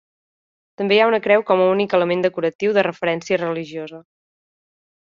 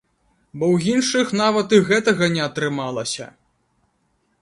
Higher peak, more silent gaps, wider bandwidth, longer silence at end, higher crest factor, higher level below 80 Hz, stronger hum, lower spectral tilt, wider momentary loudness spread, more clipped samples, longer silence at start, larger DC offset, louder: about the same, -2 dBFS vs 0 dBFS; first, 2.55-2.59 s vs none; second, 7.4 kHz vs 11.5 kHz; about the same, 1.05 s vs 1.15 s; about the same, 18 dB vs 20 dB; second, -66 dBFS vs -60 dBFS; neither; about the same, -3.5 dB/octave vs -4.5 dB/octave; about the same, 12 LU vs 11 LU; neither; first, 0.8 s vs 0.55 s; neither; about the same, -18 LUFS vs -19 LUFS